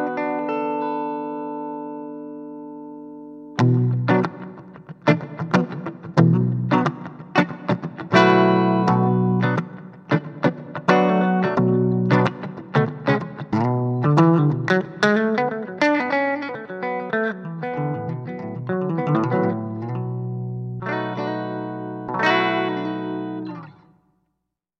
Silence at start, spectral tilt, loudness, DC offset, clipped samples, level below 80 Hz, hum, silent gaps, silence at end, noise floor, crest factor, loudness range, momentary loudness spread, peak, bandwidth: 0 s; -8 dB/octave; -21 LUFS; under 0.1%; under 0.1%; -64 dBFS; 60 Hz at -50 dBFS; none; 1.1 s; -78 dBFS; 20 dB; 6 LU; 15 LU; 0 dBFS; 8 kHz